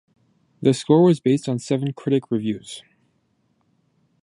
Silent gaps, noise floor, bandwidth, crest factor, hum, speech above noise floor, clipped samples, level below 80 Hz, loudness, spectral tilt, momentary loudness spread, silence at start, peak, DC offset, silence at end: none; -67 dBFS; 11.5 kHz; 20 dB; none; 47 dB; under 0.1%; -66 dBFS; -21 LUFS; -7 dB/octave; 14 LU; 0.6 s; -4 dBFS; under 0.1%; 1.4 s